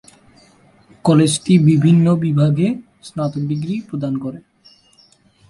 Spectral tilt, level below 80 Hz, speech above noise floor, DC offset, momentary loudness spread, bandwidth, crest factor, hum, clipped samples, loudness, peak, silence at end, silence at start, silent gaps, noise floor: -7 dB/octave; -54 dBFS; 38 dB; under 0.1%; 12 LU; 11.5 kHz; 16 dB; none; under 0.1%; -16 LUFS; -2 dBFS; 1.1 s; 1.05 s; none; -53 dBFS